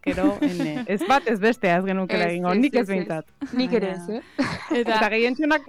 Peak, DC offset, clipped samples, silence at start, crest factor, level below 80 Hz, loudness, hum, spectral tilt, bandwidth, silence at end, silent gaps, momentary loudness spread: -10 dBFS; under 0.1%; under 0.1%; 0.05 s; 14 dB; -52 dBFS; -23 LUFS; none; -6 dB/octave; 15 kHz; 0 s; none; 8 LU